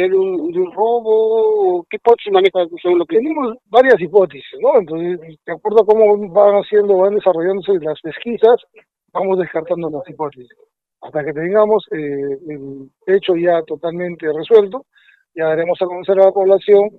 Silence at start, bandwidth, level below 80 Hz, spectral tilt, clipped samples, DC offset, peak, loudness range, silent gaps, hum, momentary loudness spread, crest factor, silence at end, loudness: 0 s; 4.6 kHz; -62 dBFS; -8 dB/octave; under 0.1%; under 0.1%; 0 dBFS; 6 LU; none; none; 13 LU; 14 dB; 0.1 s; -15 LUFS